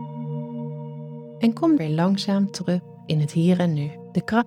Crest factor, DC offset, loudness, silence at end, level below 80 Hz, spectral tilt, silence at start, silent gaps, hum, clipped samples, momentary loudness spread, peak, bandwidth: 16 dB; under 0.1%; -23 LUFS; 0 s; -64 dBFS; -7 dB/octave; 0 s; none; none; under 0.1%; 13 LU; -8 dBFS; 11.5 kHz